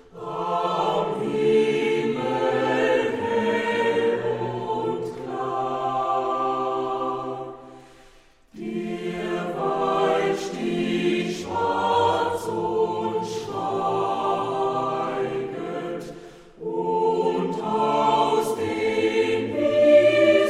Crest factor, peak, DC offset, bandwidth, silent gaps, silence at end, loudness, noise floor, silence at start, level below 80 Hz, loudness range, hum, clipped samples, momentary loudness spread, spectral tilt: 18 dB; -6 dBFS; under 0.1%; 13.5 kHz; none; 0 s; -23 LUFS; -53 dBFS; 0.15 s; -60 dBFS; 5 LU; none; under 0.1%; 10 LU; -5.5 dB/octave